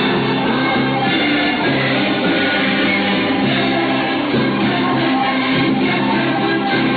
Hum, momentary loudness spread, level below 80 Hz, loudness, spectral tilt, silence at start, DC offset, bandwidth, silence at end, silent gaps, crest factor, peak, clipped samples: none; 2 LU; -48 dBFS; -16 LUFS; -8 dB/octave; 0 s; under 0.1%; 4.8 kHz; 0 s; none; 10 dB; -6 dBFS; under 0.1%